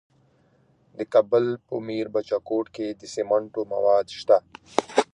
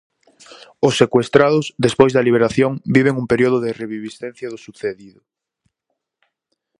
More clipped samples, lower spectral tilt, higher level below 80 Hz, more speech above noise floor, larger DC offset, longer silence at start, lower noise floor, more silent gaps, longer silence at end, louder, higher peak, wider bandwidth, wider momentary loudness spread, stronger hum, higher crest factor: neither; about the same, -5 dB/octave vs -6 dB/octave; second, -68 dBFS vs -54 dBFS; second, 38 dB vs 60 dB; neither; first, 1 s vs 0.8 s; second, -62 dBFS vs -77 dBFS; neither; second, 0.1 s vs 1.7 s; second, -24 LUFS vs -17 LUFS; about the same, -2 dBFS vs 0 dBFS; about the same, 10.5 kHz vs 11.5 kHz; second, 10 LU vs 16 LU; neither; first, 24 dB vs 18 dB